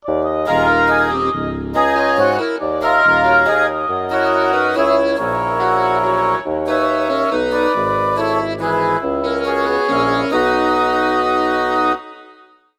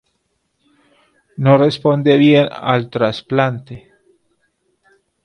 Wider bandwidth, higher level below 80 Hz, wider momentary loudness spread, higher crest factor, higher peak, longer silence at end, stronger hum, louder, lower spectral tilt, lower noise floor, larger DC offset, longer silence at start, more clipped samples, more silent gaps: first, 15 kHz vs 9.8 kHz; first, -42 dBFS vs -58 dBFS; second, 6 LU vs 21 LU; about the same, 14 dB vs 16 dB; about the same, -2 dBFS vs 0 dBFS; second, 0.45 s vs 1.45 s; neither; about the same, -16 LUFS vs -14 LUFS; second, -5.5 dB/octave vs -8 dB/octave; second, -47 dBFS vs -68 dBFS; neither; second, 0.05 s vs 1.4 s; neither; neither